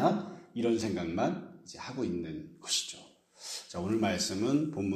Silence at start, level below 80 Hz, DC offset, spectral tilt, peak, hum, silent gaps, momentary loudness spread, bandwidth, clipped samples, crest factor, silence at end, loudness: 0 s; -66 dBFS; under 0.1%; -4.5 dB/octave; -12 dBFS; none; none; 12 LU; 14 kHz; under 0.1%; 22 dB; 0 s; -33 LUFS